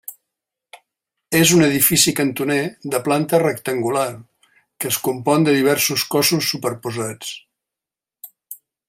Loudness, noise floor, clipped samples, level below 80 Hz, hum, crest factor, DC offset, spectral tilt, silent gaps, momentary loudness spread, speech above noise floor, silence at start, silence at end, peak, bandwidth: -18 LUFS; -88 dBFS; under 0.1%; -58 dBFS; none; 20 dB; under 0.1%; -3.5 dB/octave; none; 17 LU; 70 dB; 0.1 s; 0.35 s; 0 dBFS; 16 kHz